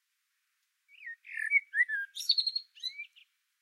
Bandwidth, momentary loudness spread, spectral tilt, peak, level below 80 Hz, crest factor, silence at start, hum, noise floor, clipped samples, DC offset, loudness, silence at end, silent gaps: 16 kHz; 19 LU; 11 dB/octave; -14 dBFS; under -90 dBFS; 20 dB; 1 s; none; -80 dBFS; under 0.1%; under 0.1%; -30 LUFS; 0.55 s; none